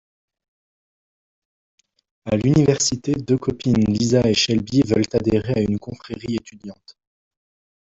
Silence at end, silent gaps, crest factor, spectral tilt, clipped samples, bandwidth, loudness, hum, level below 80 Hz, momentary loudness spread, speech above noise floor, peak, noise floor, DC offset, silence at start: 0.9 s; none; 18 dB; -5.5 dB/octave; under 0.1%; 8 kHz; -19 LUFS; none; -48 dBFS; 15 LU; over 71 dB; -4 dBFS; under -90 dBFS; under 0.1%; 2.25 s